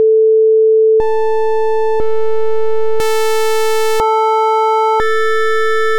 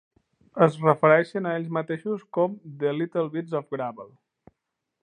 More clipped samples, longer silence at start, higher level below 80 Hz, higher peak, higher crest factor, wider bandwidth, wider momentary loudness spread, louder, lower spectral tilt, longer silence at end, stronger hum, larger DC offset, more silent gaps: neither; second, 0 s vs 0.55 s; first, -42 dBFS vs -74 dBFS; second, -6 dBFS vs -2 dBFS; second, 8 dB vs 24 dB; first, 18 kHz vs 9.8 kHz; second, 7 LU vs 13 LU; first, -13 LUFS vs -25 LUFS; second, -2.5 dB/octave vs -8 dB/octave; second, 0 s vs 0.95 s; neither; neither; neither